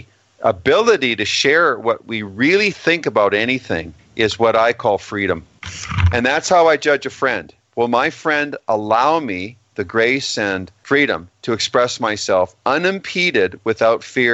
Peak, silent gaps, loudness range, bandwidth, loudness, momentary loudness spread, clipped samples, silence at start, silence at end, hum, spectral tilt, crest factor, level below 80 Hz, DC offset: 0 dBFS; none; 3 LU; 8.4 kHz; -17 LUFS; 11 LU; under 0.1%; 0.4 s; 0 s; none; -4.5 dB/octave; 18 dB; -42 dBFS; under 0.1%